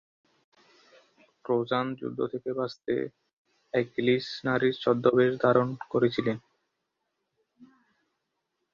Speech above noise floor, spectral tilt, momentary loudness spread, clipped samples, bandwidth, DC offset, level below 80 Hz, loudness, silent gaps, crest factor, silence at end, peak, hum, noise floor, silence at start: 54 dB; -7.5 dB/octave; 9 LU; under 0.1%; 7 kHz; under 0.1%; -68 dBFS; -28 LUFS; 3.33-3.45 s; 22 dB; 1.1 s; -6 dBFS; none; -81 dBFS; 1.5 s